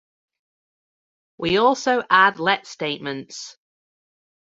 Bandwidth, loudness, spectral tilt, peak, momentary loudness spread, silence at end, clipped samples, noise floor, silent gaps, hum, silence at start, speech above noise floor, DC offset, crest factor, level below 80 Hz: 8 kHz; -20 LUFS; -3.5 dB/octave; -2 dBFS; 19 LU; 1 s; under 0.1%; under -90 dBFS; none; none; 1.4 s; over 70 dB; under 0.1%; 22 dB; -62 dBFS